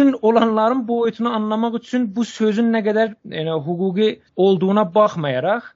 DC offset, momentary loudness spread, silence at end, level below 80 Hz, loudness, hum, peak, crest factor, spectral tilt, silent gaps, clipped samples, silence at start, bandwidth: under 0.1%; 7 LU; 0.05 s; -64 dBFS; -19 LUFS; none; -2 dBFS; 16 dB; -5.5 dB/octave; none; under 0.1%; 0 s; 7.6 kHz